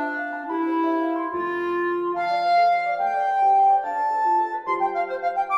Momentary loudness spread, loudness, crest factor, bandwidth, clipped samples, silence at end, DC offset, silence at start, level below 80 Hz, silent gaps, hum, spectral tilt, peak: 7 LU; -22 LUFS; 10 dB; 8.2 kHz; under 0.1%; 0 s; under 0.1%; 0 s; -68 dBFS; none; none; -5 dB/octave; -12 dBFS